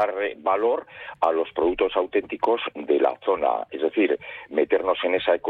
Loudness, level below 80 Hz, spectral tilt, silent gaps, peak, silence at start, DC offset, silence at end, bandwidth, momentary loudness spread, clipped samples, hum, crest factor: -24 LUFS; -58 dBFS; -6 dB/octave; none; -6 dBFS; 0 s; under 0.1%; 0 s; 4.9 kHz; 4 LU; under 0.1%; none; 16 dB